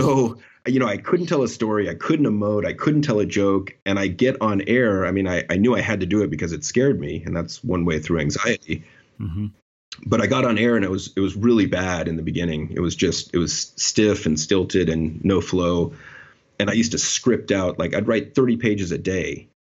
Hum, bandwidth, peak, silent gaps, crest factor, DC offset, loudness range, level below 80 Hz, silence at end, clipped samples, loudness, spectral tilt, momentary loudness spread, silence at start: none; 8.2 kHz; -4 dBFS; 3.82-3.86 s, 9.62-9.92 s; 16 dB; under 0.1%; 2 LU; -46 dBFS; 0.3 s; under 0.1%; -21 LUFS; -5 dB/octave; 8 LU; 0 s